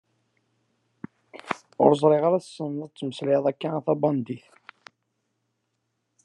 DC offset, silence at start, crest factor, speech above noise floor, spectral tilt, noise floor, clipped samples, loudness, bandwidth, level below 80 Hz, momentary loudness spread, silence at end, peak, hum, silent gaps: under 0.1%; 1.35 s; 24 dB; 54 dB; -7.5 dB/octave; -77 dBFS; under 0.1%; -24 LUFS; 10.5 kHz; -76 dBFS; 24 LU; 1.85 s; -2 dBFS; none; none